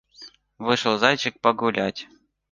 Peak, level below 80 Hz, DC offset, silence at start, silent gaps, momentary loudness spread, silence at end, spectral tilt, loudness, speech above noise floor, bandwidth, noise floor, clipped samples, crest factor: -2 dBFS; -64 dBFS; under 0.1%; 0.2 s; none; 10 LU; 0.45 s; -4 dB/octave; -22 LUFS; 26 dB; 10 kHz; -48 dBFS; under 0.1%; 22 dB